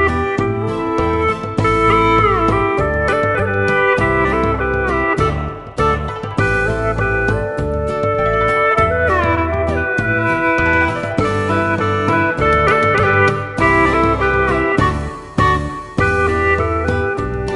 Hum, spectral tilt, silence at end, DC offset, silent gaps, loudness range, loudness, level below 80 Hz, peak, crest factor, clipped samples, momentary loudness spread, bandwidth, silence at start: none; -7 dB/octave; 0 s; under 0.1%; none; 3 LU; -15 LUFS; -28 dBFS; 0 dBFS; 16 dB; under 0.1%; 6 LU; 11.5 kHz; 0 s